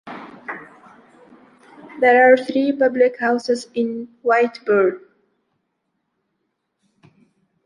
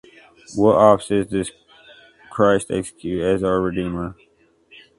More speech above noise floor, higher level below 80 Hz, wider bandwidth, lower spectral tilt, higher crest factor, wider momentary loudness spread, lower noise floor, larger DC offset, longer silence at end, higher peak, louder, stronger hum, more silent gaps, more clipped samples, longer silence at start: first, 57 dB vs 38 dB; second, -72 dBFS vs -46 dBFS; about the same, 10.5 kHz vs 11.5 kHz; about the same, -5 dB/octave vs -6 dB/octave; about the same, 18 dB vs 20 dB; first, 21 LU vs 16 LU; first, -74 dBFS vs -57 dBFS; neither; first, 2.65 s vs 0.85 s; about the same, -2 dBFS vs 0 dBFS; about the same, -17 LUFS vs -19 LUFS; neither; neither; neither; second, 0.05 s vs 0.5 s